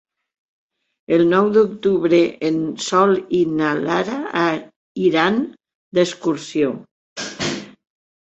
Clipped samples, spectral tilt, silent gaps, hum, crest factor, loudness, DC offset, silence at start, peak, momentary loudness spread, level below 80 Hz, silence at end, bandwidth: under 0.1%; -5 dB/octave; 4.76-4.95 s, 5.75-5.92 s, 6.91-7.16 s; none; 18 dB; -19 LUFS; under 0.1%; 1.1 s; -2 dBFS; 13 LU; -60 dBFS; 0.65 s; 8.2 kHz